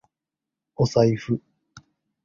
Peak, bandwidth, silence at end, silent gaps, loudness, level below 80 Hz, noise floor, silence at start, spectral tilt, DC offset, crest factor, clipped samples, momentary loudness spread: -4 dBFS; 7.4 kHz; 0.45 s; none; -23 LUFS; -54 dBFS; -87 dBFS; 0.8 s; -7 dB/octave; under 0.1%; 22 dB; under 0.1%; 11 LU